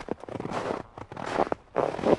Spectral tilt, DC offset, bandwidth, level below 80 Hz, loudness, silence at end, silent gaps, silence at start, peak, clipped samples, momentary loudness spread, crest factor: -6.5 dB/octave; under 0.1%; 11.5 kHz; -54 dBFS; -32 LUFS; 0 s; none; 0 s; -6 dBFS; under 0.1%; 8 LU; 22 dB